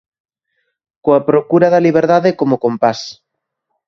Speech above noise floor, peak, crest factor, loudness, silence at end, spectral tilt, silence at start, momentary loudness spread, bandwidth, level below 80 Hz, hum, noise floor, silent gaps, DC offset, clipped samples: 63 dB; 0 dBFS; 14 dB; -13 LUFS; 0.75 s; -7 dB/octave; 1.05 s; 9 LU; 7.2 kHz; -58 dBFS; none; -75 dBFS; none; under 0.1%; under 0.1%